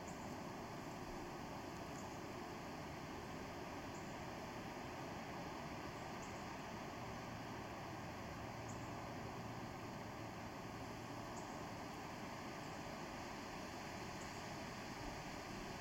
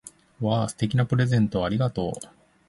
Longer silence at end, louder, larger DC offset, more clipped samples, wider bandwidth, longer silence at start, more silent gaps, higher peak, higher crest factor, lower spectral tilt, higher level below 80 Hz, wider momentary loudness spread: second, 0 s vs 0.45 s; second, -50 LUFS vs -25 LUFS; neither; neither; first, 16.5 kHz vs 11.5 kHz; about the same, 0 s vs 0.05 s; neither; second, -36 dBFS vs -10 dBFS; about the same, 14 dB vs 16 dB; second, -4.5 dB/octave vs -7 dB/octave; second, -66 dBFS vs -50 dBFS; second, 1 LU vs 10 LU